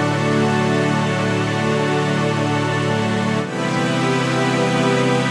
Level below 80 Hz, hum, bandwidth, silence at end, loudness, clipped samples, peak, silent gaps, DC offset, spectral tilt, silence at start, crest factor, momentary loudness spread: -54 dBFS; none; 12.5 kHz; 0 s; -18 LUFS; under 0.1%; -6 dBFS; none; under 0.1%; -5.5 dB/octave; 0 s; 12 dB; 2 LU